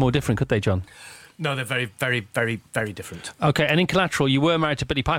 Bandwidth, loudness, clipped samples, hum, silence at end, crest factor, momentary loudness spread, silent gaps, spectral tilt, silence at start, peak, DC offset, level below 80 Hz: 16.5 kHz; -23 LUFS; under 0.1%; none; 0 s; 18 dB; 13 LU; none; -5.5 dB/octave; 0 s; -6 dBFS; under 0.1%; -44 dBFS